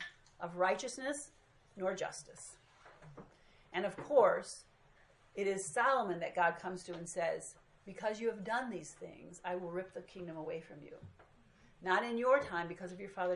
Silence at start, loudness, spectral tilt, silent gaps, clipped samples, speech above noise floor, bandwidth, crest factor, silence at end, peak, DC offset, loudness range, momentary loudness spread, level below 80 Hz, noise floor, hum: 0 s; -37 LUFS; -4 dB/octave; none; under 0.1%; 29 dB; 11.5 kHz; 22 dB; 0 s; -16 dBFS; under 0.1%; 9 LU; 21 LU; -72 dBFS; -66 dBFS; none